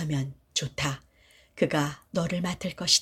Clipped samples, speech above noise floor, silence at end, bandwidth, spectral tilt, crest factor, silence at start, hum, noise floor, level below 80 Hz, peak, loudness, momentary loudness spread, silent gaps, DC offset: under 0.1%; 32 dB; 0 s; 16 kHz; -3.5 dB/octave; 22 dB; 0 s; none; -60 dBFS; -54 dBFS; -6 dBFS; -29 LUFS; 5 LU; none; under 0.1%